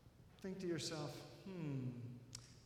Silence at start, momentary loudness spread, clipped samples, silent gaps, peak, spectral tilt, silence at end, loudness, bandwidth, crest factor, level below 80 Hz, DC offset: 0 s; 11 LU; under 0.1%; none; -32 dBFS; -5 dB/octave; 0 s; -48 LUFS; 16.5 kHz; 16 dB; -74 dBFS; under 0.1%